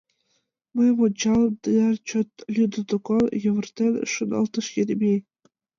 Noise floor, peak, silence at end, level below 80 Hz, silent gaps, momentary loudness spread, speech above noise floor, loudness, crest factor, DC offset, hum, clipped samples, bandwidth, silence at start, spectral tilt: -72 dBFS; -10 dBFS; 0.6 s; -58 dBFS; none; 7 LU; 50 dB; -23 LUFS; 12 dB; under 0.1%; none; under 0.1%; 7.4 kHz; 0.75 s; -5.5 dB/octave